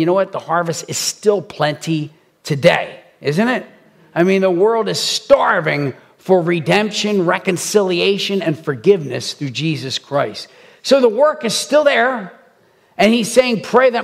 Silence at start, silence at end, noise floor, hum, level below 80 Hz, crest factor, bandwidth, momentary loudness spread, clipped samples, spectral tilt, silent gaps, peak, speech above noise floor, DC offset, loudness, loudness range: 0 s; 0 s; -53 dBFS; none; -60 dBFS; 16 dB; 16 kHz; 11 LU; under 0.1%; -4.5 dB/octave; none; 0 dBFS; 38 dB; under 0.1%; -16 LUFS; 3 LU